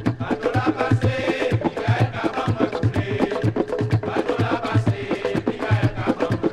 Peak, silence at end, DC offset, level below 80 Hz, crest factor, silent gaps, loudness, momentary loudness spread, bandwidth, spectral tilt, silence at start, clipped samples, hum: -4 dBFS; 0 s; under 0.1%; -44 dBFS; 16 dB; none; -22 LUFS; 3 LU; 10 kHz; -7.5 dB/octave; 0 s; under 0.1%; none